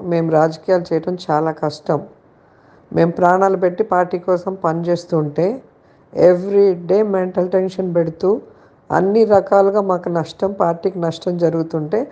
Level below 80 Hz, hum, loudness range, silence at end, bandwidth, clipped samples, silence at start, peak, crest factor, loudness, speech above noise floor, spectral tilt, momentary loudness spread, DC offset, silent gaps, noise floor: -60 dBFS; none; 2 LU; 0 s; 8.2 kHz; under 0.1%; 0 s; 0 dBFS; 16 dB; -17 LUFS; 34 dB; -8 dB/octave; 8 LU; under 0.1%; none; -50 dBFS